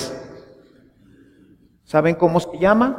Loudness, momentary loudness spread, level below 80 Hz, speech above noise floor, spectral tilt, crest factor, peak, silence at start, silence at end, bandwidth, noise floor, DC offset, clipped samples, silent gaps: -19 LUFS; 19 LU; -50 dBFS; 36 dB; -6.5 dB/octave; 20 dB; -2 dBFS; 0 s; 0 s; 15.5 kHz; -53 dBFS; under 0.1%; under 0.1%; none